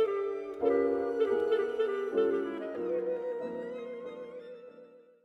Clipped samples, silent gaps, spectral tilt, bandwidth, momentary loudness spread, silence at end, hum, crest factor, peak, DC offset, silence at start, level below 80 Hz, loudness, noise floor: under 0.1%; none; -6.5 dB/octave; 6.2 kHz; 16 LU; 0.25 s; none; 16 dB; -16 dBFS; under 0.1%; 0 s; -70 dBFS; -32 LUFS; -55 dBFS